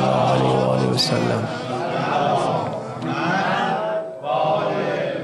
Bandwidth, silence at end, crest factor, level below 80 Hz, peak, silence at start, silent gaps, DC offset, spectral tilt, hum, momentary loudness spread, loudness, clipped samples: 12 kHz; 0 s; 14 dB; -56 dBFS; -6 dBFS; 0 s; none; under 0.1%; -5.5 dB/octave; none; 8 LU; -21 LUFS; under 0.1%